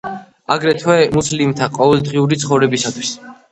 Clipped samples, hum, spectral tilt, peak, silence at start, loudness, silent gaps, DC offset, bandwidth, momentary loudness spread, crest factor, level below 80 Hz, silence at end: under 0.1%; none; -5 dB/octave; 0 dBFS; 0.05 s; -15 LUFS; none; under 0.1%; 9.4 kHz; 11 LU; 16 dB; -48 dBFS; 0.2 s